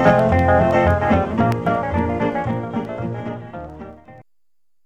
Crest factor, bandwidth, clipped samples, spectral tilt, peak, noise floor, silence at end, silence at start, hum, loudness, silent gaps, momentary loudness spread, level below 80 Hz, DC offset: 18 dB; 9 kHz; under 0.1%; -8.5 dB/octave; -2 dBFS; -84 dBFS; 0.65 s; 0 s; none; -19 LUFS; none; 19 LU; -36 dBFS; 0.2%